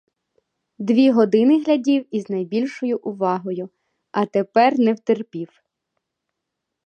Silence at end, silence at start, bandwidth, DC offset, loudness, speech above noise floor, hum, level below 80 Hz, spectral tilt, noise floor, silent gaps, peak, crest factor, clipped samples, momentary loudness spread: 1.4 s; 0.8 s; 8.4 kHz; under 0.1%; -19 LUFS; 62 dB; none; -76 dBFS; -7 dB/octave; -81 dBFS; none; -4 dBFS; 16 dB; under 0.1%; 14 LU